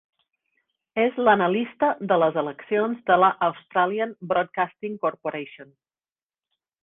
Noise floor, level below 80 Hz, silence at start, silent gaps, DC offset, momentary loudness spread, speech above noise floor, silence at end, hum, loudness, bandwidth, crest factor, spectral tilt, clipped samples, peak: under -90 dBFS; -66 dBFS; 0.95 s; none; under 0.1%; 10 LU; over 67 dB; 1.2 s; none; -23 LUFS; 4 kHz; 20 dB; -9 dB/octave; under 0.1%; -4 dBFS